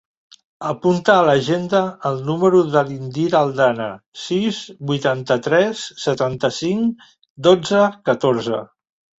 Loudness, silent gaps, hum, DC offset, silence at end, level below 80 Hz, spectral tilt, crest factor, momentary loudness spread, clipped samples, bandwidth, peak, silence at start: -18 LUFS; 4.06-4.12 s, 7.30-7.35 s; none; under 0.1%; 0.55 s; -58 dBFS; -5.5 dB/octave; 16 dB; 11 LU; under 0.1%; 8 kHz; -2 dBFS; 0.6 s